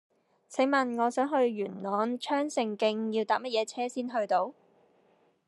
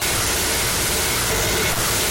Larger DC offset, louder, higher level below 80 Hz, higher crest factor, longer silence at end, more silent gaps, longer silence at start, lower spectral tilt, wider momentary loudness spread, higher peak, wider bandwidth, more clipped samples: neither; second, -30 LUFS vs -18 LUFS; second, under -90 dBFS vs -34 dBFS; first, 16 dB vs 10 dB; first, 0.95 s vs 0 s; neither; first, 0.5 s vs 0 s; first, -4.5 dB/octave vs -2 dB/octave; first, 6 LU vs 0 LU; second, -14 dBFS vs -10 dBFS; second, 12 kHz vs 17 kHz; neither